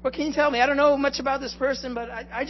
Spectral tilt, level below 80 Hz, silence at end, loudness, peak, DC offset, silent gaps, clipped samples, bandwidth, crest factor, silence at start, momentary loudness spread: -4 dB/octave; -48 dBFS; 0 s; -23 LUFS; -6 dBFS; under 0.1%; none; under 0.1%; 6.2 kHz; 16 dB; 0 s; 12 LU